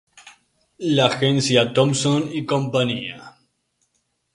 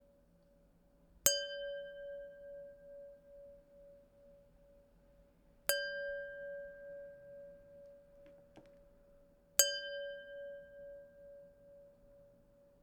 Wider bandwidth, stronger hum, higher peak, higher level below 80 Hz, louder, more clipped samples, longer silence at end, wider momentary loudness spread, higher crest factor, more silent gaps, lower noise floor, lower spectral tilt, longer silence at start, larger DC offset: second, 11.5 kHz vs 19.5 kHz; neither; first, 0 dBFS vs -10 dBFS; first, -60 dBFS vs -72 dBFS; first, -20 LUFS vs -38 LUFS; neither; first, 1.05 s vs 0.15 s; second, 12 LU vs 29 LU; second, 22 dB vs 36 dB; neither; about the same, -71 dBFS vs -68 dBFS; first, -5 dB/octave vs 1 dB/octave; second, 0.25 s vs 1.1 s; neither